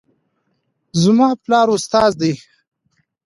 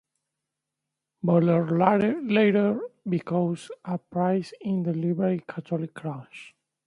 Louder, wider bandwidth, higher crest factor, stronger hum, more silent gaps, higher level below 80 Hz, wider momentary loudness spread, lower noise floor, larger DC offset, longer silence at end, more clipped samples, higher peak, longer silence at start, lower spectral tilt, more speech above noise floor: first, -15 LUFS vs -25 LUFS; about the same, 11.5 kHz vs 11 kHz; about the same, 16 dB vs 20 dB; neither; neither; first, -54 dBFS vs -68 dBFS; second, 9 LU vs 13 LU; second, -68 dBFS vs -85 dBFS; neither; first, 0.9 s vs 0.4 s; neither; first, -2 dBFS vs -6 dBFS; second, 0.95 s vs 1.25 s; second, -5.5 dB/octave vs -8.5 dB/octave; second, 54 dB vs 61 dB